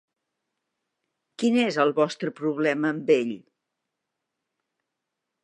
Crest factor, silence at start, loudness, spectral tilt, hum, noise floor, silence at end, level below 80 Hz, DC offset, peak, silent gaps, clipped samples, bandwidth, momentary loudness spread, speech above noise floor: 20 dB; 1.4 s; -24 LUFS; -5.5 dB/octave; none; -83 dBFS; 2.05 s; -82 dBFS; under 0.1%; -8 dBFS; none; under 0.1%; 11 kHz; 7 LU; 60 dB